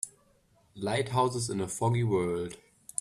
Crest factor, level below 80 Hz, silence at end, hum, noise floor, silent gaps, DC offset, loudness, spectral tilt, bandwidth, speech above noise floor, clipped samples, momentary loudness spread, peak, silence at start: 18 dB; -62 dBFS; 0.45 s; none; -66 dBFS; none; under 0.1%; -31 LUFS; -5 dB/octave; 13 kHz; 36 dB; under 0.1%; 12 LU; -12 dBFS; 0.05 s